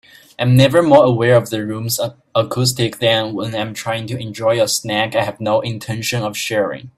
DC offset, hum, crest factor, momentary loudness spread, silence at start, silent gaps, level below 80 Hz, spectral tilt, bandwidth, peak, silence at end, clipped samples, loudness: under 0.1%; none; 16 dB; 11 LU; 0.4 s; none; -52 dBFS; -5 dB/octave; 15.5 kHz; 0 dBFS; 0.1 s; under 0.1%; -16 LUFS